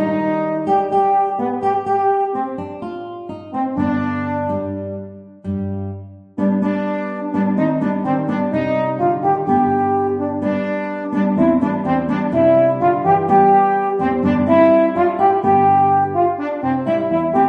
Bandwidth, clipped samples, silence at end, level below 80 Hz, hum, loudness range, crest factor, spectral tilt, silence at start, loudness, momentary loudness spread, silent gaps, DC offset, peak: 6 kHz; under 0.1%; 0 s; -54 dBFS; none; 8 LU; 14 dB; -9.5 dB/octave; 0 s; -17 LUFS; 14 LU; none; under 0.1%; -2 dBFS